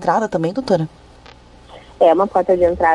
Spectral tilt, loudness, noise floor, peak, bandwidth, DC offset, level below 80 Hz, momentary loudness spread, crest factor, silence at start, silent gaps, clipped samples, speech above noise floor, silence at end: -7 dB/octave; -16 LUFS; -43 dBFS; -2 dBFS; 11 kHz; under 0.1%; -44 dBFS; 7 LU; 16 dB; 0 s; none; under 0.1%; 28 dB; 0 s